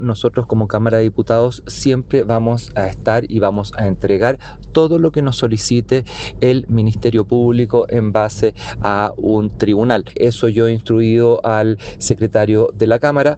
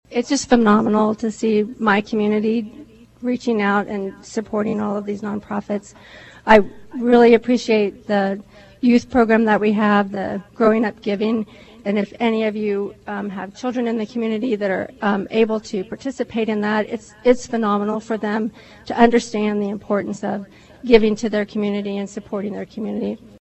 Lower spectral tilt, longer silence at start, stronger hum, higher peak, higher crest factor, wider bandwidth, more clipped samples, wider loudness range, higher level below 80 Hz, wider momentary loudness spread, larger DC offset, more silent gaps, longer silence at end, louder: about the same, -6.5 dB/octave vs -6 dB/octave; about the same, 0 s vs 0.1 s; neither; about the same, 0 dBFS vs 0 dBFS; second, 14 dB vs 20 dB; about the same, 9 kHz vs 8.4 kHz; neither; second, 2 LU vs 6 LU; first, -38 dBFS vs -48 dBFS; second, 5 LU vs 13 LU; neither; neither; second, 0 s vs 0.3 s; first, -14 LUFS vs -20 LUFS